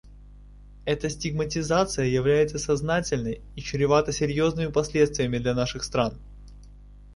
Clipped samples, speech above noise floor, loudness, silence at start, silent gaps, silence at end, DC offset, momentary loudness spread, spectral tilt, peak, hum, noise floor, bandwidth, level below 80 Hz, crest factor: under 0.1%; 22 dB; -25 LUFS; 0.05 s; none; 0 s; under 0.1%; 8 LU; -5 dB/octave; -6 dBFS; 50 Hz at -40 dBFS; -47 dBFS; 11.5 kHz; -44 dBFS; 20 dB